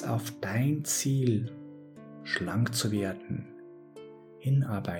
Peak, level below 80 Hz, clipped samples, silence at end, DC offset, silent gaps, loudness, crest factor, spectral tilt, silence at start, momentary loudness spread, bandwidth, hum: -14 dBFS; -66 dBFS; under 0.1%; 0 s; under 0.1%; none; -30 LUFS; 16 dB; -5 dB/octave; 0 s; 21 LU; 19 kHz; none